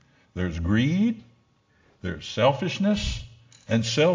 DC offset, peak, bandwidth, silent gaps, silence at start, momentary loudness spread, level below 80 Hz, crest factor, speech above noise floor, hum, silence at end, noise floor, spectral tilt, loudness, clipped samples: under 0.1%; -8 dBFS; 7.6 kHz; none; 0.35 s; 15 LU; -40 dBFS; 18 dB; 40 dB; none; 0 s; -63 dBFS; -6 dB/octave; -25 LUFS; under 0.1%